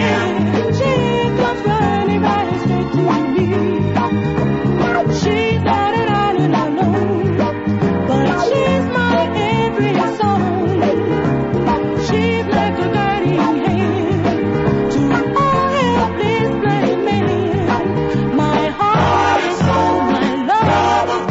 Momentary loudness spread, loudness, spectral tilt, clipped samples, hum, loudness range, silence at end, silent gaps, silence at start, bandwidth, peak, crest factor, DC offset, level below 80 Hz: 2 LU; -16 LUFS; -7 dB/octave; under 0.1%; none; 1 LU; 0 s; none; 0 s; 8 kHz; -2 dBFS; 14 dB; under 0.1%; -38 dBFS